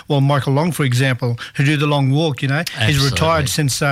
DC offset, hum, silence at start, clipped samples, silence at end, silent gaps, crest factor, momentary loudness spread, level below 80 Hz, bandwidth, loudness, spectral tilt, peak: under 0.1%; none; 0.1 s; under 0.1%; 0 s; none; 10 dB; 4 LU; -40 dBFS; 15.5 kHz; -17 LUFS; -5 dB/octave; -6 dBFS